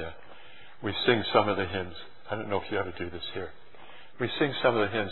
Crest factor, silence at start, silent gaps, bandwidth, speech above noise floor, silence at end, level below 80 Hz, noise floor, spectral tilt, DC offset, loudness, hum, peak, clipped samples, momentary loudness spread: 24 dB; 0 s; none; 4.3 kHz; 24 dB; 0 s; -60 dBFS; -52 dBFS; -8.5 dB/octave; 0.8%; -29 LUFS; none; -6 dBFS; under 0.1%; 16 LU